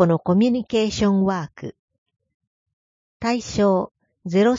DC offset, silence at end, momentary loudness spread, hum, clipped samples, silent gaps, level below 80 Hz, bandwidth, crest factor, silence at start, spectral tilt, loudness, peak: under 0.1%; 0 s; 16 LU; none; under 0.1%; 1.79-1.88 s, 1.98-2.06 s, 2.34-2.40 s, 2.47-2.66 s, 2.73-3.20 s; -50 dBFS; 7.6 kHz; 18 dB; 0 s; -6.5 dB/octave; -21 LUFS; -4 dBFS